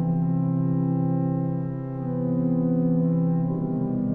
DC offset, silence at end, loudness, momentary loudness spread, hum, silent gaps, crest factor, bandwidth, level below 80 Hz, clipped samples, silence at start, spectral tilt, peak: under 0.1%; 0 s; -25 LUFS; 6 LU; none; none; 10 dB; 2 kHz; -52 dBFS; under 0.1%; 0 s; -14 dB/octave; -12 dBFS